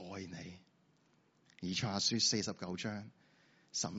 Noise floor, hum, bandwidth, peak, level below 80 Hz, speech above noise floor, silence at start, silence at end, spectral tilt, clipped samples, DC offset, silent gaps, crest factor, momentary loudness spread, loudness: -72 dBFS; none; 8 kHz; -20 dBFS; -76 dBFS; 35 dB; 0 s; 0 s; -3.5 dB/octave; under 0.1%; under 0.1%; none; 20 dB; 18 LU; -36 LUFS